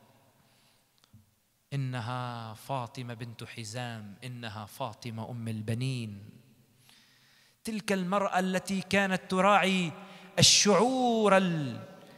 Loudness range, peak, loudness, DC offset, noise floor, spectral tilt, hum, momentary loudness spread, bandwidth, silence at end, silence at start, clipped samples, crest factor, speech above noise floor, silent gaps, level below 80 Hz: 14 LU; -8 dBFS; -28 LUFS; under 0.1%; -70 dBFS; -3.5 dB/octave; none; 19 LU; 15 kHz; 0.05 s; 1.15 s; under 0.1%; 22 dB; 40 dB; none; -64 dBFS